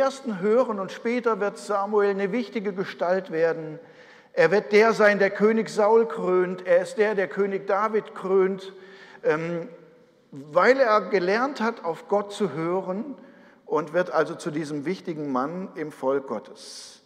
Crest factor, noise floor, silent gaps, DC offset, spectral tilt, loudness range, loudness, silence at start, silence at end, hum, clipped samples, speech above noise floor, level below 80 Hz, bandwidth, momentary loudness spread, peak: 18 dB; -54 dBFS; none; under 0.1%; -6 dB/octave; 7 LU; -24 LUFS; 0 s; 0.1 s; none; under 0.1%; 31 dB; -80 dBFS; 11 kHz; 14 LU; -6 dBFS